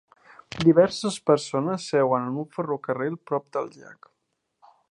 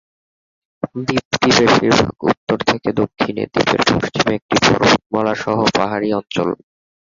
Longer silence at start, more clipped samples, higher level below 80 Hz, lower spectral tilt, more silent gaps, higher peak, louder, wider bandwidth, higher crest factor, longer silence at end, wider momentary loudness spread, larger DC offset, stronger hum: second, 0.55 s vs 0.85 s; neither; second, -64 dBFS vs -46 dBFS; first, -6 dB/octave vs -4.5 dB/octave; second, none vs 1.25-1.31 s, 2.37-2.47 s, 4.42-4.49 s, 5.06-5.10 s; second, -4 dBFS vs 0 dBFS; second, -24 LUFS vs -16 LUFS; first, 11.5 kHz vs 7.6 kHz; first, 22 dB vs 16 dB; first, 1 s vs 0.65 s; first, 12 LU vs 9 LU; neither; neither